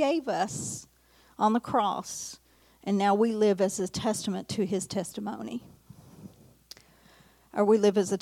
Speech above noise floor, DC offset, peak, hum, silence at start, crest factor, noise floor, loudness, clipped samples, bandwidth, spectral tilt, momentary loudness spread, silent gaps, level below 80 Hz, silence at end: 31 dB; under 0.1%; -10 dBFS; none; 0 s; 18 dB; -59 dBFS; -28 LUFS; under 0.1%; 16 kHz; -5 dB/octave; 17 LU; none; -66 dBFS; 0.05 s